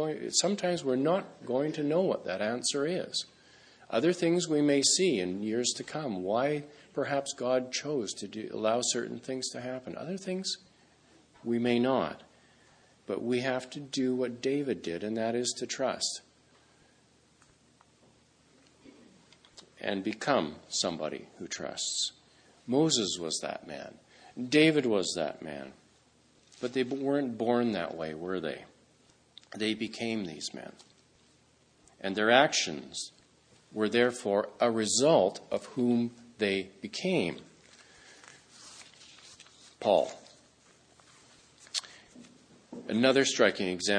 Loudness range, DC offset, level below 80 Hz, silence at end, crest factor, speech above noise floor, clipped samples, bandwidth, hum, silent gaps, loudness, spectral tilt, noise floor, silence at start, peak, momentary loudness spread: 8 LU; under 0.1%; -74 dBFS; 0 s; 26 dB; 35 dB; under 0.1%; 10.5 kHz; none; none; -30 LUFS; -3.5 dB/octave; -65 dBFS; 0 s; -6 dBFS; 17 LU